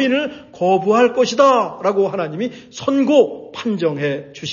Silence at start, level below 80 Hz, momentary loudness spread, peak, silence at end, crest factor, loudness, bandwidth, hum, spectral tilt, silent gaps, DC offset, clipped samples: 0 s; -62 dBFS; 12 LU; -2 dBFS; 0 s; 16 dB; -17 LUFS; 7.4 kHz; none; -5.5 dB/octave; none; under 0.1%; under 0.1%